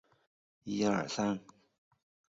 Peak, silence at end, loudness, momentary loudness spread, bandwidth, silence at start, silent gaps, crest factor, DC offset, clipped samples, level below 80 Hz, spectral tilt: -18 dBFS; 0.9 s; -34 LUFS; 10 LU; 7.6 kHz; 0.65 s; none; 20 dB; under 0.1%; under 0.1%; -72 dBFS; -5 dB/octave